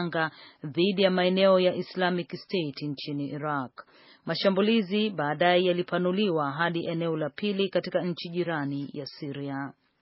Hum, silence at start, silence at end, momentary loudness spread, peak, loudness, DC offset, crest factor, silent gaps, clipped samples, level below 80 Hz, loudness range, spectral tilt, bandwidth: none; 0 s; 0.3 s; 12 LU; -8 dBFS; -27 LUFS; under 0.1%; 20 dB; none; under 0.1%; -76 dBFS; 4 LU; -4 dB/octave; 5.8 kHz